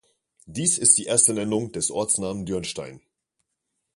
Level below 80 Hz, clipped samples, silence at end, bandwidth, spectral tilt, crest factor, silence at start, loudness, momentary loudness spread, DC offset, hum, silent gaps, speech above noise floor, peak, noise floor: -56 dBFS; under 0.1%; 0.95 s; 12 kHz; -3 dB/octave; 24 dB; 0.5 s; -21 LUFS; 17 LU; under 0.1%; none; none; 56 dB; -2 dBFS; -79 dBFS